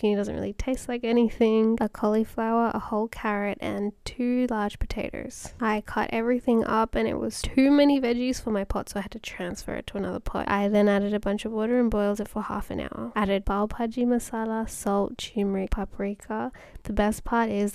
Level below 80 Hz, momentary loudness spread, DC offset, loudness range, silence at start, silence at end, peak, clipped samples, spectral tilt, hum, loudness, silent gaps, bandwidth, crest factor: -40 dBFS; 11 LU; under 0.1%; 4 LU; 0 s; 0 s; -10 dBFS; under 0.1%; -5.5 dB/octave; none; -26 LUFS; none; 15 kHz; 16 dB